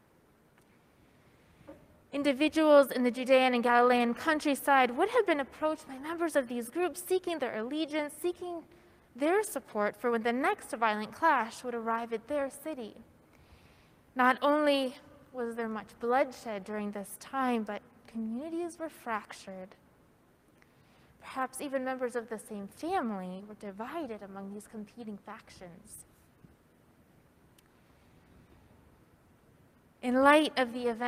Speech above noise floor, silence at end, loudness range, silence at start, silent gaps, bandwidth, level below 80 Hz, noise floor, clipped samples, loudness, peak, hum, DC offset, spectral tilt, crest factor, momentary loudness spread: 34 dB; 0 s; 15 LU; 1.7 s; none; 15.5 kHz; -70 dBFS; -65 dBFS; under 0.1%; -31 LUFS; -8 dBFS; none; under 0.1%; -4 dB/octave; 24 dB; 20 LU